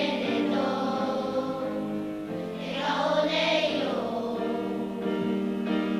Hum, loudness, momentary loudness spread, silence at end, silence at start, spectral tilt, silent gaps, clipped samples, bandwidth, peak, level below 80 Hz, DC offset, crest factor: none; -28 LUFS; 8 LU; 0 s; 0 s; -5.5 dB/octave; none; under 0.1%; 15.5 kHz; -14 dBFS; -62 dBFS; under 0.1%; 14 dB